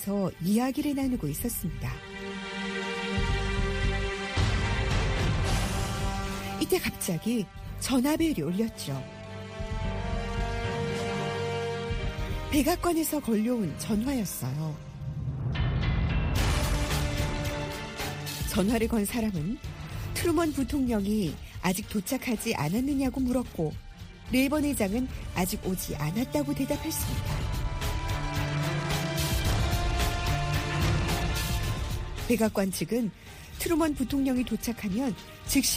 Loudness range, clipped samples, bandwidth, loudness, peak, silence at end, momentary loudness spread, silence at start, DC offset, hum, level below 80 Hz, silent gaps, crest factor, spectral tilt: 2 LU; under 0.1%; 15.5 kHz; -30 LUFS; -12 dBFS; 0 s; 8 LU; 0 s; under 0.1%; none; -36 dBFS; none; 16 dB; -5 dB/octave